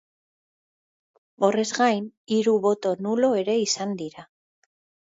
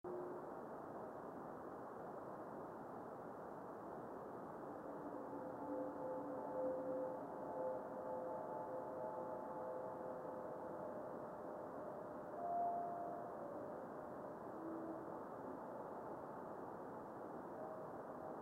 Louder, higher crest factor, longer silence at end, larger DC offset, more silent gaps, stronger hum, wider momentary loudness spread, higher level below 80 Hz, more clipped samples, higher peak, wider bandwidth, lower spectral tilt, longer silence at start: first, -23 LUFS vs -49 LUFS; about the same, 18 dB vs 14 dB; first, 0.85 s vs 0 s; neither; first, 2.17-2.25 s vs none; neither; about the same, 8 LU vs 7 LU; first, -74 dBFS vs -82 dBFS; neither; first, -6 dBFS vs -34 dBFS; second, 8 kHz vs 16.5 kHz; second, -4 dB/octave vs -8 dB/octave; first, 1.4 s vs 0.05 s